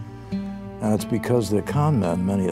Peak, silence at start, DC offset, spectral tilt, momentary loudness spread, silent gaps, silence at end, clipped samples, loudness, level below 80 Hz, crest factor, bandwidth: -8 dBFS; 0 s; under 0.1%; -7.5 dB/octave; 10 LU; none; 0 s; under 0.1%; -23 LUFS; -48 dBFS; 16 dB; 15.5 kHz